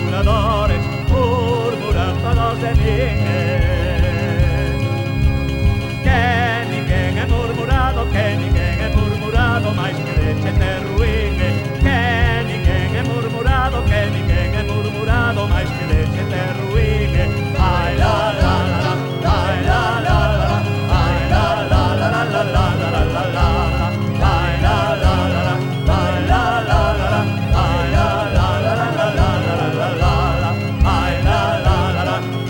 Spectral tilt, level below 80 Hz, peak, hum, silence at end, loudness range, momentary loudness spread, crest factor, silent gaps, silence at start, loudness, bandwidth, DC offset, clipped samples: -6.5 dB/octave; -22 dBFS; -2 dBFS; none; 0 s; 1 LU; 3 LU; 14 dB; none; 0 s; -17 LUFS; 17 kHz; under 0.1%; under 0.1%